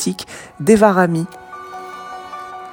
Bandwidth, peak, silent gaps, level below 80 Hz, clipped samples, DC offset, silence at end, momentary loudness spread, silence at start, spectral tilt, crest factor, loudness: 17 kHz; 0 dBFS; none; -50 dBFS; under 0.1%; under 0.1%; 0 s; 21 LU; 0 s; -5.5 dB/octave; 18 dB; -15 LUFS